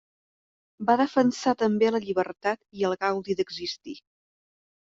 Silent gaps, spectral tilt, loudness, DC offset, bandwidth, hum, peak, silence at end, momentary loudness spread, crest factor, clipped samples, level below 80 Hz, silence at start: none; -5 dB/octave; -26 LUFS; under 0.1%; 7.8 kHz; none; -6 dBFS; 0.8 s; 11 LU; 20 dB; under 0.1%; -68 dBFS; 0.8 s